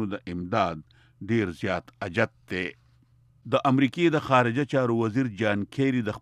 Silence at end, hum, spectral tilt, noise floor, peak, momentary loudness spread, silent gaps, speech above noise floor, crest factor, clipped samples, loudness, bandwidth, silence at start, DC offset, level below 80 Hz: 0 s; none; -7 dB/octave; -60 dBFS; -8 dBFS; 10 LU; none; 35 dB; 18 dB; under 0.1%; -26 LUFS; 11 kHz; 0 s; under 0.1%; -60 dBFS